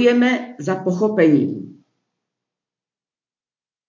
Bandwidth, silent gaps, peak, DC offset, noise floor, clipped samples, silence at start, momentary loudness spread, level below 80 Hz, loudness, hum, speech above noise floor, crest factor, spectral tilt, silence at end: 7.4 kHz; none; -4 dBFS; under 0.1%; under -90 dBFS; under 0.1%; 0 s; 13 LU; -80 dBFS; -18 LUFS; none; over 73 dB; 18 dB; -7 dB/octave; 2.15 s